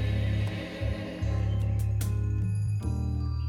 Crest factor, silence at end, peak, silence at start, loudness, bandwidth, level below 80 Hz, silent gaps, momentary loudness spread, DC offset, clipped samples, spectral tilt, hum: 10 dB; 0 s; -18 dBFS; 0 s; -30 LUFS; 14.5 kHz; -34 dBFS; none; 4 LU; under 0.1%; under 0.1%; -7 dB/octave; none